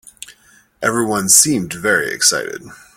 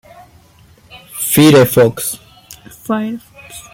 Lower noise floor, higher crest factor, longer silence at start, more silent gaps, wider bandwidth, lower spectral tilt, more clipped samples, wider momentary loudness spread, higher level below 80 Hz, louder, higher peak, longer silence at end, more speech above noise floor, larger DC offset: first, -51 dBFS vs -46 dBFS; about the same, 18 dB vs 16 dB; second, 0.3 s vs 0.95 s; neither; first, over 20 kHz vs 17 kHz; second, -1.5 dB/octave vs -5 dB/octave; neither; second, 13 LU vs 23 LU; about the same, -54 dBFS vs -50 dBFS; about the same, -14 LUFS vs -12 LUFS; about the same, 0 dBFS vs 0 dBFS; about the same, 0.2 s vs 0.15 s; about the same, 35 dB vs 35 dB; neither